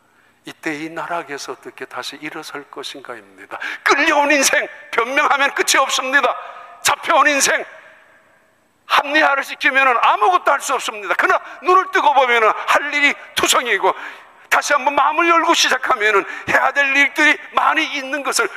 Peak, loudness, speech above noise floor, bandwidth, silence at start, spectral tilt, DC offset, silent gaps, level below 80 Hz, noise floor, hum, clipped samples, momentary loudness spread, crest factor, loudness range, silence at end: -2 dBFS; -15 LUFS; 41 dB; 15.5 kHz; 0.45 s; -0.5 dB/octave; under 0.1%; none; -62 dBFS; -58 dBFS; none; under 0.1%; 16 LU; 16 dB; 4 LU; 0 s